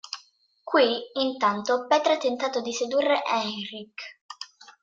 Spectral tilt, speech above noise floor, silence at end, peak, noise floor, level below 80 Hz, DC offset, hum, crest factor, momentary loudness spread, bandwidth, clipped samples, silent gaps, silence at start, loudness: -3 dB/octave; 34 dB; 0.4 s; -8 dBFS; -59 dBFS; -76 dBFS; under 0.1%; none; 18 dB; 19 LU; 7.8 kHz; under 0.1%; 4.21-4.29 s; 0.05 s; -25 LUFS